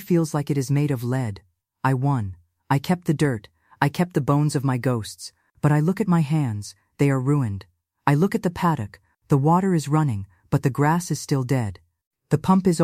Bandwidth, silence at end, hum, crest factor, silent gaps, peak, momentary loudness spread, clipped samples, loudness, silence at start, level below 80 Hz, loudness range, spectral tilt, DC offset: 15.5 kHz; 0 s; none; 20 dB; 12.07-12.11 s; -4 dBFS; 12 LU; under 0.1%; -23 LUFS; 0 s; -54 dBFS; 2 LU; -7 dB/octave; under 0.1%